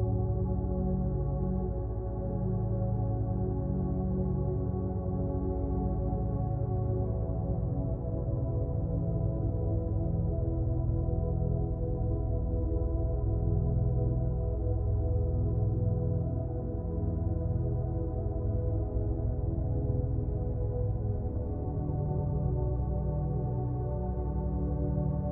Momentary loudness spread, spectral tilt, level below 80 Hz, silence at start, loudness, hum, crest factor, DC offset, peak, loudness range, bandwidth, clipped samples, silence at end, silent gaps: 3 LU; -16 dB/octave; -34 dBFS; 0 s; -32 LUFS; none; 12 dB; under 0.1%; -18 dBFS; 2 LU; 1.8 kHz; under 0.1%; 0 s; none